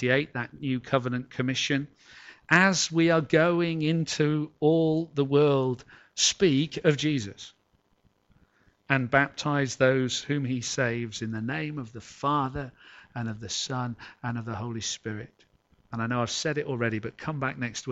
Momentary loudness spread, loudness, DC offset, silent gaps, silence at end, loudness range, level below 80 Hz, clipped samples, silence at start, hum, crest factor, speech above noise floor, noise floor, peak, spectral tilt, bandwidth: 14 LU; -27 LUFS; under 0.1%; none; 0 s; 8 LU; -60 dBFS; under 0.1%; 0 s; none; 22 dB; 41 dB; -68 dBFS; -6 dBFS; -4.5 dB/octave; 8.2 kHz